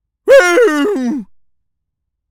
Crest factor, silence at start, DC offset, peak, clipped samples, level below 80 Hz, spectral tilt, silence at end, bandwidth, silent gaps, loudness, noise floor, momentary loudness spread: 12 dB; 0.25 s; under 0.1%; 0 dBFS; under 0.1%; -54 dBFS; -3 dB/octave; 1.05 s; 16.5 kHz; none; -11 LUFS; -75 dBFS; 13 LU